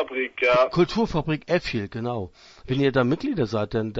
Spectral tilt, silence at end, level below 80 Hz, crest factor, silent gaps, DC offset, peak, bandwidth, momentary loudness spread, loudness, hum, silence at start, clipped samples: -7 dB/octave; 0 s; -46 dBFS; 16 dB; none; under 0.1%; -8 dBFS; 8 kHz; 10 LU; -24 LUFS; none; 0 s; under 0.1%